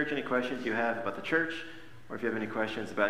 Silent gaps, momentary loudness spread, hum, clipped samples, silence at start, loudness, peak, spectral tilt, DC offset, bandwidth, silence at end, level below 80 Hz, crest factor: none; 12 LU; none; under 0.1%; 0 s; -32 LUFS; -12 dBFS; -5.5 dB/octave; 0.5%; 15.5 kHz; 0 s; -68 dBFS; 20 dB